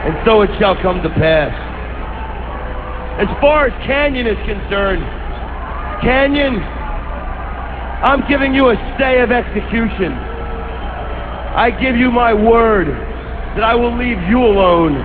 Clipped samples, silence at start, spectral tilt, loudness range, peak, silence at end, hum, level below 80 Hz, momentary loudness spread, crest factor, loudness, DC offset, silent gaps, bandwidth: under 0.1%; 0 s; -9.5 dB/octave; 4 LU; 0 dBFS; 0 s; none; -24 dBFS; 14 LU; 14 dB; -15 LUFS; 0.7%; none; 4.8 kHz